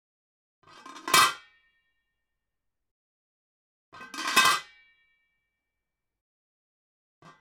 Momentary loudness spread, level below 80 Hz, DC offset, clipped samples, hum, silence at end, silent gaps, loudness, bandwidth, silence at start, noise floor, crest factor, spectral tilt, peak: 20 LU; -72 dBFS; under 0.1%; under 0.1%; none; 2.8 s; 2.91-3.92 s; -23 LUFS; 17.5 kHz; 0.85 s; -86 dBFS; 26 dB; 0.5 dB/octave; -6 dBFS